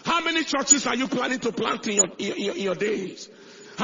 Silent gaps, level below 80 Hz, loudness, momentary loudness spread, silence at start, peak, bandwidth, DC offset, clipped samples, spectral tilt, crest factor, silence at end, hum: none; -64 dBFS; -23 LUFS; 16 LU; 0.05 s; -4 dBFS; 7.6 kHz; under 0.1%; under 0.1%; -2 dB/octave; 22 dB; 0 s; none